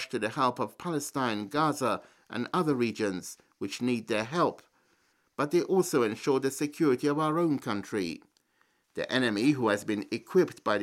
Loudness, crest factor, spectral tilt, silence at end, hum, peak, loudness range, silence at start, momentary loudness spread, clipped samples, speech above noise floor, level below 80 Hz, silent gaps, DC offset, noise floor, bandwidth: -29 LUFS; 18 dB; -5 dB/octave; 0 s; none; -12 dBFS; 3 LU; 0 s; 11 LU; under 0.1%; 42 dB; -72 dBFS; none; under 0.1%; -71 dBFS; 16 kHz